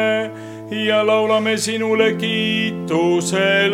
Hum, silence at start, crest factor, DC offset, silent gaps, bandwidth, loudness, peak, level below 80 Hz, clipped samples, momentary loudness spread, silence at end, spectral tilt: none; 0 s; 14 dB; under 0.1%; none; 16 kHz; -18 LUFS; -4 dBFS; -64 dBFS; under 0.1%; 7 LU; 0 s; -4 dB/octave